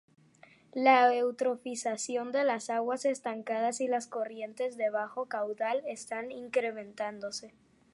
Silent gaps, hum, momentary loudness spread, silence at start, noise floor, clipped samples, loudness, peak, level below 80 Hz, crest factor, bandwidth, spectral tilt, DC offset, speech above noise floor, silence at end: none; none; 13 LU; 0.75 s; -60 dBFS; under 0.1%; -31 LUFS; -10 dBFS; -82 dBFS; 22 dB; 11.5 kHz; -2.5 dB/octave; under 0.1%; 29 dB; 0.45 s